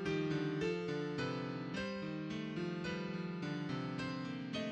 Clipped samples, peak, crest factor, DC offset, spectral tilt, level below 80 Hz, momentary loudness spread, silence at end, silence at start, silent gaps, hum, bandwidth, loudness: under 0.1%; -26 dBFS; 14 dB; under 0.1%; -6.5 dB/octave; -68 dBFS; 5 LU; 0 s; 0 s; none; none; 9 kHz; -40 LUFS